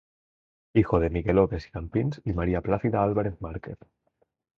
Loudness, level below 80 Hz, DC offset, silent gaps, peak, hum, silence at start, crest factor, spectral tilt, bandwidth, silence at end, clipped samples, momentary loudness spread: -26 LUFS; -42 dBFS; under 0.1%; none; -6 dBFS; none; 0.75 s; 20 dB; -10 dB/octave; 6.8 kHz; 0.85 s; under 0.1%; 14 LU